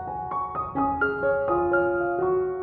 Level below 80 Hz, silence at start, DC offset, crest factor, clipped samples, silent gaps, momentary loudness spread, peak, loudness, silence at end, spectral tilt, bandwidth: -50 dBFS; 0 s; under 0.1%; 14 dB; under 0.1%; none; 6 LU; -12 dBFS; -25 LUFS; 0 s; -10.5 dB/octave; 4.2 kHz